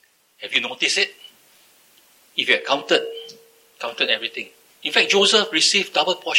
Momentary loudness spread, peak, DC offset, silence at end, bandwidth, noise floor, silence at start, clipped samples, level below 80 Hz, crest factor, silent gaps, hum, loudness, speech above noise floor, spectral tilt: 17 LU; 0 dBFS; under 0.1%; 0 s; 17 kHz; -55 dBFS; 0.4 s; under 0.1%; -84 dBFS; 22 dB; none; none; -19 LUFS; 35 dB; -1 dB/octave